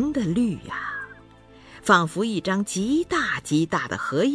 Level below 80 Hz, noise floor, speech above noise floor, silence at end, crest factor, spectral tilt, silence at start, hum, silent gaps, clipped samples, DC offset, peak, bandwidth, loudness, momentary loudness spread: -52 dBFS; -49 dBFS; 26 dB; 0 s; 20 dB; -5 dB/octave; 0 s; none; none; under 0.1%; under 0.1%; -4 dBFS; 11 kHz; -24 LUFS; 12 LU